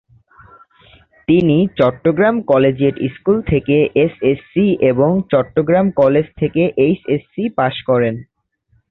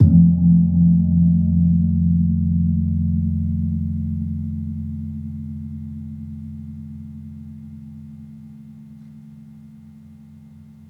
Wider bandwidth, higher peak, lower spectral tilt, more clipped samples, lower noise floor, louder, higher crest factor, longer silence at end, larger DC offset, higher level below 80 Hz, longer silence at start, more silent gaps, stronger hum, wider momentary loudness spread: first, 4.5 kHz vs 0.9 kHz; about the same, -2 dBFS vs -2 dBFS; second, -10.5 dB/octave vs -13.5 dB/octave; neither; first, -60 dBFS vs -43 dBFS; first, -15 LUFS vs -19 LUFS; about the same, 14 dB vs 18 dB; first, 0.7 s vs 0.5 s; neither; about the same, -44 dBFS vs -40 dBFS; first, 1.3 s vs 0 s; neither; neither; second, 6 LU vs 24 LU